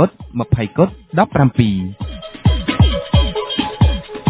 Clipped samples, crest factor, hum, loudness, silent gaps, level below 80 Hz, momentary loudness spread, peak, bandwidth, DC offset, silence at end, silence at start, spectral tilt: under 0.1%; 16 dB; none; -17 LUFS; none; -22 dBFS; 9 LU; 0 dBFS; 4 kHz; under 0.1%; 0 s; 0 s; -11 dB/octave